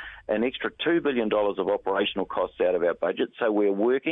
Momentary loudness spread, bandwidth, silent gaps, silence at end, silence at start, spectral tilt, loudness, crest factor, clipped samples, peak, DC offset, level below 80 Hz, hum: 5 LU; 4 kHz; none; 0 s; 0 s; -8.5 dB/octave; -26 LUFS; 14 dB; under 0.1%; -12 dBFS; under 0.1%; -58 dBFS; none